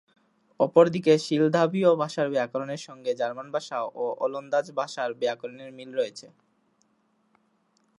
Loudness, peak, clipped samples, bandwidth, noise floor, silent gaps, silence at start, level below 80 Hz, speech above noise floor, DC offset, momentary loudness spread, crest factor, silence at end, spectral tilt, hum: -26 LUFS; -6 dBFS; under 0.1%; 11 kHz; -69 dBFS; none; 0.6 s; -78 dBFS; 44 dB; under 0.1%; 13 LU; 22 dB; 1.75 s; -6 dB/octave; none